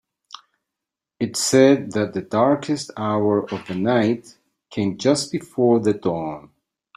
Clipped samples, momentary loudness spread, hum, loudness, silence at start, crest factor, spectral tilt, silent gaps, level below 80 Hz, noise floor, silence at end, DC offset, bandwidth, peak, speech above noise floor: under 0.1%; 12 LU; none; -20 LUFS; 1.2 s; 18 dB; -5 dB/octave; none; -62 dBFS; -85 dBFS; 0.55 s; under 0.1%; 14.5 kHz; -2 dBFS; 66 dB